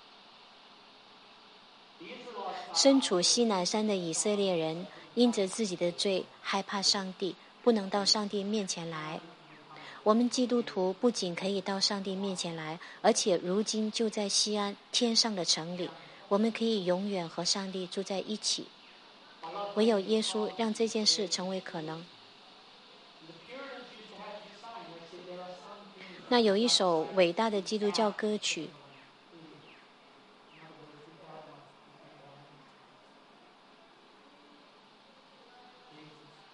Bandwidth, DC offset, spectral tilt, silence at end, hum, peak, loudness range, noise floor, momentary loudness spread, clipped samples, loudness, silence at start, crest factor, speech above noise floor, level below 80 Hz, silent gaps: 11.5 kHz; under 0.1%; -3 dB/octave; 0.4 s; none; -10 dBFS; 9 LU; -59 dBFS; 21 LU; under 0.1%; -30 LUFS; 2 s; 22 dB; 29 dB; -84 dBFS; none